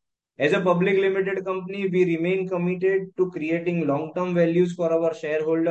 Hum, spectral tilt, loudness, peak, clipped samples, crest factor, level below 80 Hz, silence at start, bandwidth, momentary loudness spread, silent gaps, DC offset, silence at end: none; -7.5 dB/octave; -23 LUFS; -6 dBFS; under 0.1%; 16 dB; -74 dBFS; 0.4 s; 8.2 kHz; 6 LU; none; under 0.1%; 0 s